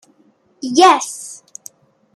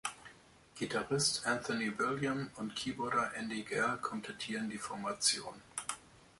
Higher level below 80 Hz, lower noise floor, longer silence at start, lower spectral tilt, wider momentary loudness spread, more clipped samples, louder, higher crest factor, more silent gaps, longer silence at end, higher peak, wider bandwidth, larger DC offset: about the same, -66 dBFS vs -70 dBFS; second, -56 dBFS vs -60 dBFS; first, 0.65 s vs 0.05 s; second, -1.5 dB/octave vs -3 dB/octave; first, 25 LU vs 12 LU; neither; first, -13 LUFS vs -36 LUFS; about the same, 18 dB vs 22 dB; neither; first, 0.8 s vs 0.15 s; first, 0 dBFS vs -16 dBFS; first, 14.5 kHz vs 12 kHz; neither